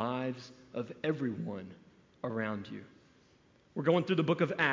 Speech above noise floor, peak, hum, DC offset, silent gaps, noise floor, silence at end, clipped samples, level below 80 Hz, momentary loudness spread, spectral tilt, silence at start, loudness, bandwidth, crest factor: 32 dB; -14 dBFS; none; under 0.1%; none; -65 dBFS; 0 s; under 0.1%; -72 dBFS; 17 LU; -7.5 dB/octave; 0 s; -34 LUFS; 7.6 kHz; 22 dB